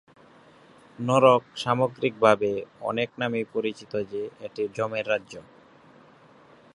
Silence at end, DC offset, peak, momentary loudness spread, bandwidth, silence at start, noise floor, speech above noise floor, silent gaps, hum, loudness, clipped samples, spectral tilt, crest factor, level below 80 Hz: 1.35 s; under 0.1%; -2 dBFS; 14 LU; 11 kHz; 1 s; -54 dBFS; 29 dB; none; none; -25 LUFS; under 0.1%; -6 dB/octave; 24 dB; -68 dBFS